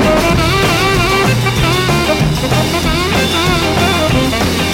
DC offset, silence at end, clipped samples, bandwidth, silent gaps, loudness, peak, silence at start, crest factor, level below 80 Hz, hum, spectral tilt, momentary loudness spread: under 0.1%; 0 s; under 0.1%; 16.5 kHz; none; -12 LUFS; 0 dBFS; 0 s; 12 dB; -24 dBFS; none; -4.5 dB/octave; 2 LU